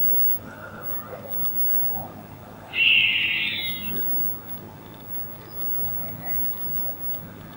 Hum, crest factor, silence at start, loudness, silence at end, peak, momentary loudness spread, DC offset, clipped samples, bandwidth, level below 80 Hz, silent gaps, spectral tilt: none; 18 dB; 0 s; -22 LUFS; 0 s; -6 dBFS; 18 LU; under 0.1%; under 0.1%; 16.5 kHz; -58 dBFS; none; -3.5 dB/octave